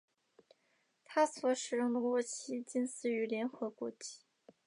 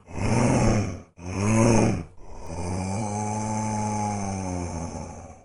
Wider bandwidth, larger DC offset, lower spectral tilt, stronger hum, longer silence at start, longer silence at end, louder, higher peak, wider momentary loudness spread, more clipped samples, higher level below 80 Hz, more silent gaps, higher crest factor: about the same, 11 kHz vs 11.5 kHz; neither; second, -3 dB/octave vs -6 dB/octave; neither; first, 1.1 s vs 0.05 s; first, 0.5 s vs 0.05 s; second, -36 LUFS vs -26 LUFS; second, -18 dBFS vs -4 dBFS; second, 11 LU vs 17 LU; neither; second, under -90 dBFS vs -40 dBFS; neither; about the same, 20 dB vs 20 dB